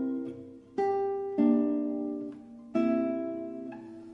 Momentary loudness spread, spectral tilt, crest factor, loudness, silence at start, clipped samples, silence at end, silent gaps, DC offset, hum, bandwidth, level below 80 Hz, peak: 17 LU; -8.5 dB/octave; 16 dB; -30 LUFS; 0 s; under 0.1%; 0 s; none; under 0.1%; none; 6.2 kHz; -72 dBFS; -14 dBFS